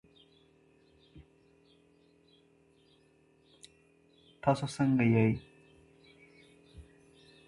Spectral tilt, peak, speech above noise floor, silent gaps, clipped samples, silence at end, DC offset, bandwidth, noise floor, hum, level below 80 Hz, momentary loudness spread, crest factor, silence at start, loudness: -7.5 dB/octave; -14 dBFS; 38 dB; none; under 0.1%; 0.65 s; under 0.1%; 11.5 kHz; -66 dBFS; none; -64 dBFS; 30 LU; 22 dB; 1.15 s; -30 LUFS